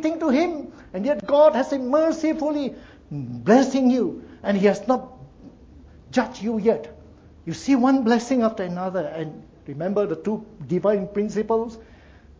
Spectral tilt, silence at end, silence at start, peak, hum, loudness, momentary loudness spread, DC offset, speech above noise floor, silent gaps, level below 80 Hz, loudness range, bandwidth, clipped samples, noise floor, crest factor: -6.5 dB/octave; 0.55 s; 0 s; -4 dBFS; none; -22 LUFS; 16 LU; under 0.1%; 27 dB; none; -54 dBFS; 5 LU; 8 kHz; under 0.1%; -48 dBFS; 20 dB